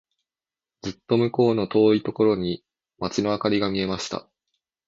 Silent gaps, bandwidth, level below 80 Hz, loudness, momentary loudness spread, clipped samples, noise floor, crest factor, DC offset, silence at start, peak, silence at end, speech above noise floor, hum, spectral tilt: none; 7.8 kHz; -56 dBFS; -23 LUFS; 15 LU; under 0.1%; under -90 dBFS; 18 dB; under 0.1%; 0.85 s; -6 dBFS; 0.65 s; over 68 dB; none; -6 dB/octave